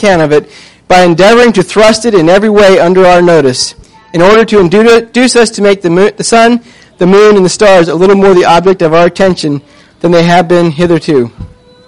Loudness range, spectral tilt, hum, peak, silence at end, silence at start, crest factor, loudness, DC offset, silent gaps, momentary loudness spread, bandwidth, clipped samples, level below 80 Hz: 2 LU; -5 dB/octave; none; 0 dBFS; 0.4 s; 0 s; 6 dB; -6 LUFS; 3%; none; 7 LU; 11.5 kHz; 3%; -34 dBFS